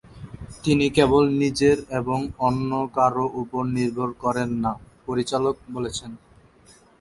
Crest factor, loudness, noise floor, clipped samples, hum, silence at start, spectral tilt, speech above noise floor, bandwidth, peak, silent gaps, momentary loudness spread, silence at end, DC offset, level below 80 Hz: 20 dB; -23 LUFS; -54 dBFS; under 0.1%; none; 0.05 s; -6 dB/octave; 31 dB; 11.5 kHz; -4 dBFS; none; 12 LU; 0.85 s; under 0.1%; -48 dBFS